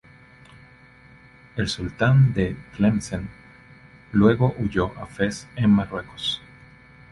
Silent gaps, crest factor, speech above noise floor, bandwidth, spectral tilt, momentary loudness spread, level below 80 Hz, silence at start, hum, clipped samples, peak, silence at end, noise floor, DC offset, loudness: none; 18 dB; 29 dB; 11.5 kHz; -6.5 dB/octave; 14 LU; -44 dBFS; 1.55 s; none; under 0.1%; -4 dBFS; 0.75 s; -50 dBFS; under 0.1%; -23 LUFS